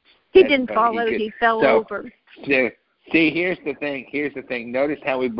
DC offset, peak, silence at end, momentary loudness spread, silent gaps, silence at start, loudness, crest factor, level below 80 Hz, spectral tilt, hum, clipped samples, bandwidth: under 0.1%; -2 dBFS; 0 s; 11 LU; none; 0.35 s; -20 LUFS; 20 dB; -56 dBFS; -9.5 dB/octave; none; under 0.1%; 5.6 kHz